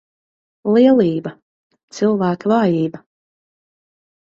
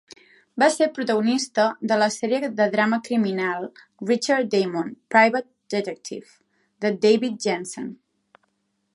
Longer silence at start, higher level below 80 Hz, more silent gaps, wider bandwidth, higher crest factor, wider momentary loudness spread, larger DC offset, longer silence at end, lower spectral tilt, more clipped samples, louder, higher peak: about the same, 0.65 s vs 0.55 s; first, -62 dBFS vs -76 dBFS; first, 1.42-1.70 s, 1.83-1.88 s vs none; second, 7.6 kHz vs 11.5 kHz; about the same, 16 dB vs 20 dB; about the same, 14 LU vs 14 LU; neither; first, 1.35 s vs 1 s; first, -7.5 dB/octave vs -4.5 dB/octave; neither; first, -16 LUFS vs -22 LUFS; about the same, -2 dBFS vs -2 dBFS